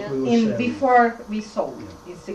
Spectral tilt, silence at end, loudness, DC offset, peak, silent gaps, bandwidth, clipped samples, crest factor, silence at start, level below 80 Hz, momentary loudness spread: -6 dB/octave; 0 s; -21 LUFS; under 0.1%; -6 dBFS; none; 9 kHz; under 0.1%; 16 dB; 0 s; -54 dBFS; 21 LU